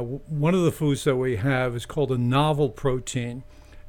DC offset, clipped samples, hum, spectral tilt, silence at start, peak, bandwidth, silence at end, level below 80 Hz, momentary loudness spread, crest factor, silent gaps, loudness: under 0.1%; under 0.1%; none; -6.5 dB/octave; 0 s; -10 dBFS; 18 kHz; 0 s; -44 dBFS; 9 LU; 14 dB; none; -24 LUFS